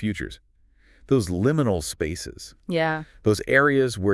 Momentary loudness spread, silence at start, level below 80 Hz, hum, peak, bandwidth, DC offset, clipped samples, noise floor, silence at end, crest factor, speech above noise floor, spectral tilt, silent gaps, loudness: 15 LU; 0 s; -48 dBFS; none; -4 dBFS; 12 kHz; under 0.1%; under 0.1%; -57 dBFS; 0 s; 20 dB; 34 dB; -5.5 dB/octave; none; -23 LUFS